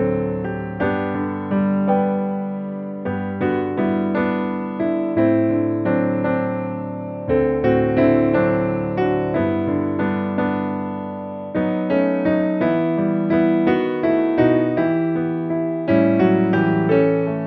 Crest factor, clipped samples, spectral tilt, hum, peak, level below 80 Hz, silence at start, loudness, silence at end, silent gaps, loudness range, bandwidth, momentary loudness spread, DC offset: 16 dB; under 0.1%; -11 dB/octave; none; -4 dBFS; -48 dBFS; 0 s; -20 LUFS; 0 s; none; 4 LU; 4.9 kHz; 9 LU; under 0.1%